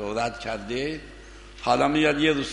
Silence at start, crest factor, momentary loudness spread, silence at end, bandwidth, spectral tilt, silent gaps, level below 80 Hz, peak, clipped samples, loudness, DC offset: 0 s; 18 dB; 23 LU; 0 s; 10.5 kHz; -4.5 dB/octave; none; -46 dBFS; -6 dBFS; under 0.1%; -25 LUFS; under 0.1%